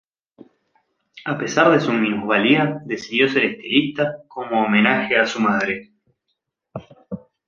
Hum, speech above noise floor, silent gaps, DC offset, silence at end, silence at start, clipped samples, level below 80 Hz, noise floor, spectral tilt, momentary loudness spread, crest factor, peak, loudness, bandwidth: none; 57 dB; none; under 0.1%; 0.3 s; 1.15 s; under 0.1%; -62 dBFS; -76 dBFS; -5 dB/octave; 20 LU; 20 dB; -2 dBFS; -19 LUFS; 7.4 kHz